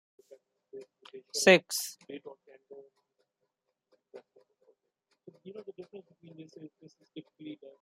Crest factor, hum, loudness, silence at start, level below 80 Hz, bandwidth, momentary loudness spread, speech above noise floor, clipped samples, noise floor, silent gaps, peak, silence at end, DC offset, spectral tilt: 28 dB; none; -26 LUFS; 0.75 s; -84 dBFS; 15 kHz; 30 LU; 50 dB; under 0.1%; -83 dBFS; none; -8 dBFS; 0.1 s; under 0.1%; -3 dB/octave